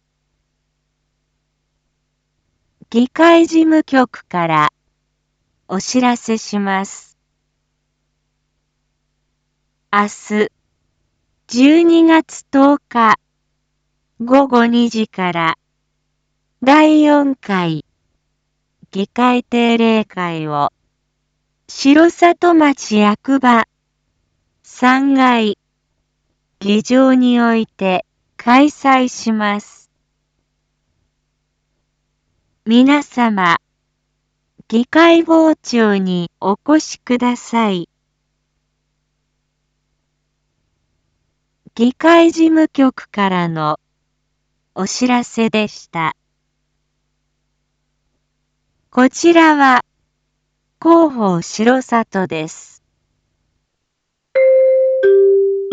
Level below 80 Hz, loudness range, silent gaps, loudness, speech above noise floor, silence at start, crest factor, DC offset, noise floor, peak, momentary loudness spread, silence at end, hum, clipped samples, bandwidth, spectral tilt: -62 dBFS; 9 LU; none; -13 LUFS; 60 dB; 2.9 s; 16 dB; under 0.1%; -73 dBFS; 0 dBFS; 12 LU; 0 s; none; under 0.1%; 8 kHz; -5 dB/octave